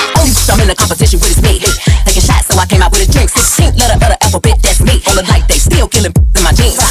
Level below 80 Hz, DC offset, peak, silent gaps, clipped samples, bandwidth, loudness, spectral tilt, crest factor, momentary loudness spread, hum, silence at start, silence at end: -10 dBFS; under 0.1%; 0 dBFS; none; under 0.1%; 16 kHz; -9 LUFS; -3.5 dB/octave; 8 dB; 2 LU; none; 0 s; 0 s